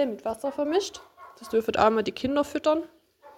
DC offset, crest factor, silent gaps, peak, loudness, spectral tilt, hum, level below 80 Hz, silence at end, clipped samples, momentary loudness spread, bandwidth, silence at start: under 0.1%; 22 dB; none; -6 dBFS; -26 LUFS; -4.5 dB/octave; none; -58 dBFS; 0.05 s; under 0.1%; 16 LU; 16.5 kHz; 0 s